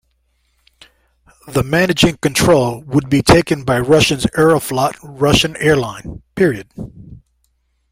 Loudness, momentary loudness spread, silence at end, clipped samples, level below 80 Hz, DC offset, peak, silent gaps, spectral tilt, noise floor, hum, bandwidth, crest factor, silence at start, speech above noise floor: -14 LUFS; 14 LU; 0.75 s; under 0.1%; -36 dBFS; under 0.1%; 0 dBFS; none; -5 dB/octave; -63 dBFS; none; 16.5 kHz; 16 dB; 1.45 s; 49 dB